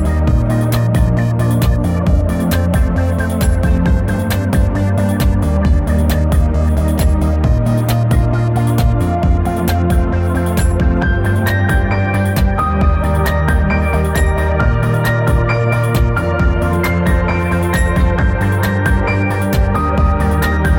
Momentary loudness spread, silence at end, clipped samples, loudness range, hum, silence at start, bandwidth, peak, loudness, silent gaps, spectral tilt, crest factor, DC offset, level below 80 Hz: 1 LU; 0 s; under 0.1%; 1 LU; none; 0 s; 17 kHz; 0 dBFS; -15 LUFS; none; -7 dB/octave; 12 dB; under 0.1%; -18 dBFS